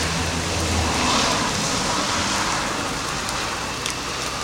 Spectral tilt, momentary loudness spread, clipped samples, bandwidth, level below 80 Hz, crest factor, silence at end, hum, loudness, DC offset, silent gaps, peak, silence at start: -2.5 dB/octave; 6 LU; under 0.1%; 16.5 kHz; -40 dBFS; 20 dB; 0 s; none; -22 LUFS; under 0.1%; none; -4 dBFS; 0 s